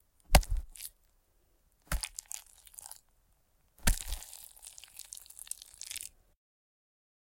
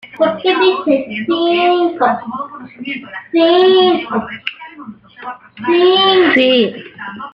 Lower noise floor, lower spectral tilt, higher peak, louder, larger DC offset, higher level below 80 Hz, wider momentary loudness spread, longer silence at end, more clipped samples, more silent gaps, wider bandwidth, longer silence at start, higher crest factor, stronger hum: first, -70 dBFS vs -34 dBFS; second, -3 dB/octave vs -6.5 dB/octave; second, -6 dBFS vs 0 dBFS; second, -36 LUFS vs -13 LUFS; neither; first, -40 dBFS vs -58 dBFS; about the same, 20 LU vs 19 LU; first, 1.3 s vs 0.05 s; neither; neither; first, 17 kHz vs 5.4 kHz; first, 0.3 s vs 0.05 s; first, 32 dB vs 14 dB; neither